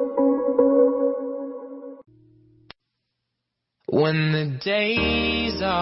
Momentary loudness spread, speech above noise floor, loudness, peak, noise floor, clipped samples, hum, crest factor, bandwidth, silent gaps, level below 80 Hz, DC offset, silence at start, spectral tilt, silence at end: 18 LU; 58 dB; -22 LUFS; -6 dBFS; -81 dBFS; under 0.1%; none; 16 dB; 5.8 kHz; none; -46 dBFS; under 0.1%; 0 s; -9.5 dB/octave; 0 s